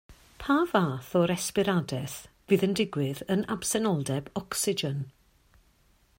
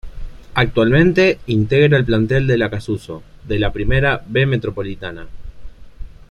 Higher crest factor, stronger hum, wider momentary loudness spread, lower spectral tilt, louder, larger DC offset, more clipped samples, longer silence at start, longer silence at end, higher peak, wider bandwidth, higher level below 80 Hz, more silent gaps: about the same, 20 dB vs 16 dB; neither; second, 10 LU vs 14 LU; second, -5 dB/octave vs -7.5 dB/octave; second, -28 LUFS vs -16 LUFS; neither; neither; about the same, 0.1 s vs 0.05 s; first, 1.1 s vs 0.2 s; second, -10 dBFS vs -2 dBFS; first, 16.5 kHz vs 10.5 kHz; second, -58 dBFS vs -32 dBFS; neither